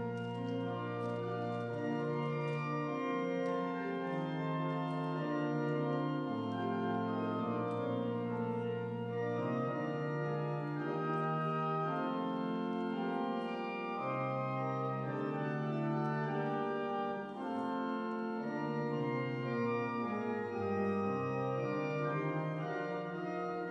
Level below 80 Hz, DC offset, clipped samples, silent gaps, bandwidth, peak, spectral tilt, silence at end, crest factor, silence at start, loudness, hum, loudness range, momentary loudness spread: -80 dBFS; under 0.1%; under 0.1%; none; 7.6 kHz; -24 dBFS; -8.5 dB/octave; 0 s; 12 dB; 0 s; -37 LUFS; none; 1 LU; 3 LU